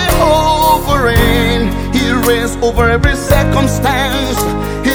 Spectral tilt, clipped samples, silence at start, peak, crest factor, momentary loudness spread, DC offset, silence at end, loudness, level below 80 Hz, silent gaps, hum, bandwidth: -5 dB/octave; under 0.1%; 0 s; 0 dBFS; 12 dB; 5 LU; under 0.1%; 0 s; -12 LUFS; -20 dBFS; none; none; over 20 kHz